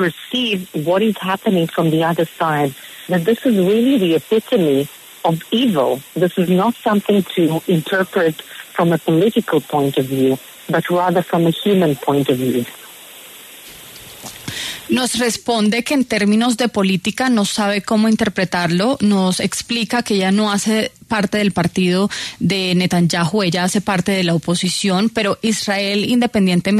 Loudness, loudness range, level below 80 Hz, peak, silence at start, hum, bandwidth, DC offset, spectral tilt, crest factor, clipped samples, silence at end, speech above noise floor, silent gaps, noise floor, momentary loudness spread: -17 LUFS; 3 LU; -54 dBFS; -4 dBFS; 0 s; none; 13.5 kHz; under 0.1%; -5 dB/octave; 14 dB; under 0.1%; 0 s; 22 dB; none; -38 dBFS; 7 LU